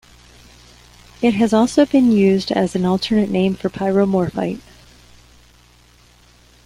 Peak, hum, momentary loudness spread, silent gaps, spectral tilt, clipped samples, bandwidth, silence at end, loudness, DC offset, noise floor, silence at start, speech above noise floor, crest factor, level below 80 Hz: -2 dBFS; 60 Hz at -40 dBFS; 8 LU; none; -6.5 dB/octave; under 0.1%; 12 kHz; 2.05 s; -17 LUFS; under 0.1%; -50 dBFS; 1.2 s; 34 dB; 16 dB; -48 dBFS